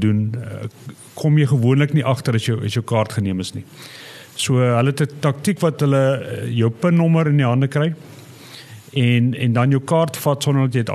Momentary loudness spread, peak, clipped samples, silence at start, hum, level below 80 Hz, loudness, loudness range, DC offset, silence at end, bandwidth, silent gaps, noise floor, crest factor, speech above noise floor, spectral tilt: 18 LU; -2 dBFS; under 0.1%; 0 s; none; -64 dBFS; -18 LUFS; 3 LU; under 0.1%; 0 s; 13 kHz; none; -40 dBFS; 16 dB; 22 dB; -6.5 dB/octave